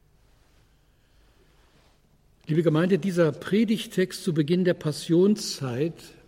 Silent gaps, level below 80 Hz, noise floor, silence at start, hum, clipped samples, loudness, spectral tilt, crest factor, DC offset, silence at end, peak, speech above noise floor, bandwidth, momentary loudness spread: none; -62 dBFS; -61 dBFS; 2.5 s; none; under 0.1%; -25 LUFS; -6.5 dB/octave; 18 dB; under 0.1%; 0.2 s; -10 dBFS; 37 dB; 16.5 kHz; 7 LU